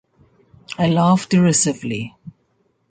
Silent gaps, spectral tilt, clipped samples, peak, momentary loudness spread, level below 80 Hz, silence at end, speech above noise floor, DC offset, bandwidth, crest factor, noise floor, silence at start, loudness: none; -5 dB/octave; under 0.1%; -4 dBFS; 15 LU; -56 dBFS; 0.6 s; 48 dB; under 0.1%; 9.6 kHz; 16 dB; -64 dBFS; 0.7 s; -17 LUFS